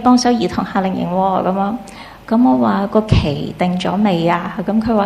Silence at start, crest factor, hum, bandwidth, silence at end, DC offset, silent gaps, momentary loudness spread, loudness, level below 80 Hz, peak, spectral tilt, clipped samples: 0 s; 14 dB; none; 12.5 kHz; 0 s; under 0.1%; none; 7 LU; -16 LUFS; -34 dBFS; -2 dBFS; -6.5 dB/octave; under 0.1%